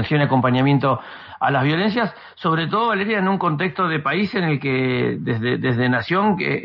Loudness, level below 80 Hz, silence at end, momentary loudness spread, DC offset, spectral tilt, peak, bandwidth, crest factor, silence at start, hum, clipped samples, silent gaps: -20 LUFS; -58 dBFS; 0 s; 5 LU; under 0.1%; -9 dB/octave; -4 dBFS; 5.8 kHz; 16 dB; 0 s; none; under 0.1%; none